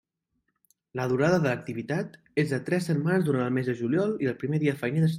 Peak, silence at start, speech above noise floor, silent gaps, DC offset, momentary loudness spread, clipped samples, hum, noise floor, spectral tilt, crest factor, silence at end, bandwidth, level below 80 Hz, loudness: -12 dBFS; 0.95 s; 52 dB; none; under 0.1%; 8 LU; under 0.1%; none; -78 dBFS; -7.5 dB/octave; 16 dB; 0 s; 15 kHz; -64 dBFS; -27 LUFS